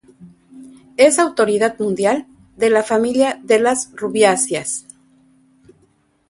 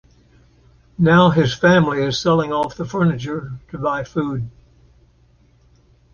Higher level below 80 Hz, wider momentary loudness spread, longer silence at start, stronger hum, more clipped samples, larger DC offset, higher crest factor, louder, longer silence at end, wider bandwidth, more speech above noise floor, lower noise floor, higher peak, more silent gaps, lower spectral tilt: second, -60 dBFS vs -48 dBFS; second, 9 LU vs 15 LU; second, 0.2 s vs 1 s; neither; neither; neither; about the same, 18 dB vs 18 dB; about the same, -16 LUFS vs -18 LUFS; second, 1.5 s vs 1.65 s; first, 11.5 kHz vs 7 kHz; first, 43 dB vs 37 dB; first, -59 dBFS vs -54 dBFS; about the same, 0 dBFS vs -2 dBFS; neither; second, -3 dB/octave vs -6.5 dB/octave